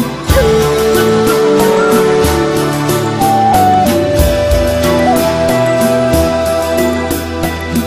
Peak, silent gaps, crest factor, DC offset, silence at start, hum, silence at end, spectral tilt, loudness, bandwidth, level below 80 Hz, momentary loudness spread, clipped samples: 0 dBFS; none; 10 dB; 0.2%; 0 s; none; 0 s; -5 dB/octave; -11 LUFS; 16 kHz; -24 dBFS; 4 LU; under 0.1%